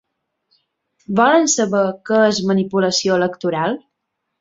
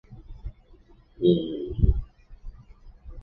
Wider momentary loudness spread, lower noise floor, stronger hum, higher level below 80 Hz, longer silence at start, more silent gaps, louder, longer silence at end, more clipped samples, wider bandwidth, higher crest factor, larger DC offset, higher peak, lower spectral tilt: second, 8 LU vs 26 LU; first, -76 dBFS vs -54 dBFS; neither; second, -60 dBFS vs -32 dBFS; first, 1.1 s vs 0.1 s; neither; first, -17 LUFS vs -25 LUFS; first, 0.65 s vs 0 s; neither; first, 8 kHz vs 4.2 kHz; second, 16 dB vs 22 dB; neither; first, -2 dBFS vs -6 dBFS; second, -4 dB/octave vs -11.5 dB/octave